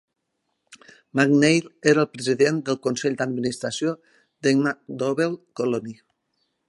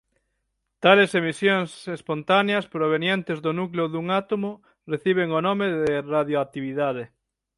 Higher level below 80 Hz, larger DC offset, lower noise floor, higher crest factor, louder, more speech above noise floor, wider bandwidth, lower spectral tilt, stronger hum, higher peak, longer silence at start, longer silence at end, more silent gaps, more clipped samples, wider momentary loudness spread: second, -70 dBFS vs -64 dBFS; neither; about the same, -77 dBFS vs -77 dBFS; about the same, 20 dB vs 22 dB; about the same, -23 LUFS vs -23 LUFS; about the same, 54 dB vs 54 dB; about the same, 11.5 kHz vs 11.5 kHz; about the same, -5 dB/octave vs -6 dB/octave; neither; about the same, -2 dBFS vs -2 dBFS; about the same, 0.7 s vs 0.8 s; first, 0.75 s vs 0.5 s; neither; neither; second, 9 LU vs 12 LU